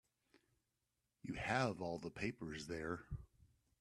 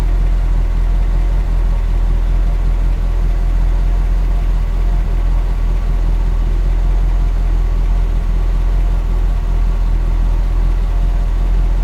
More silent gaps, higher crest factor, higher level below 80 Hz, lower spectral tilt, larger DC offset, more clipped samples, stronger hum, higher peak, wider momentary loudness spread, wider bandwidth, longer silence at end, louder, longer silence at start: neither; first, 24 dB vs 8 dB; second, -64 dBFS vs -14 dBFS; second, -5.5 dB/octave vs -7.5 dB/octave; neither; neither; neither; second, -22 dBFS vs -4 dBFS; first, 14 LU vs 1 LU; first, 13 kHz vs 4.8 kHz; first, 0.35 s vs 0 s; second, -44 LUFS vs -18 LUFS; first, 1.25 s vs 0 s